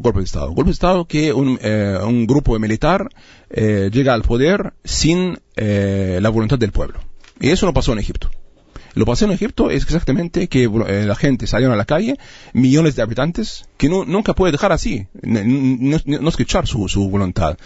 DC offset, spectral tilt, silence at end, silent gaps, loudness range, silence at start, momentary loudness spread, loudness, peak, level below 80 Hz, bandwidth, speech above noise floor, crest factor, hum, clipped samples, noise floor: under 0.1%; -6 dB/octave; 0.1 s; none; 2 LU; 0 s; 7 LU; -17 LUFS; -2 dBFS; -28 dBFS; 8 kHz; 23 dB; 14 dB; none; under 0.1%; -39 dBFS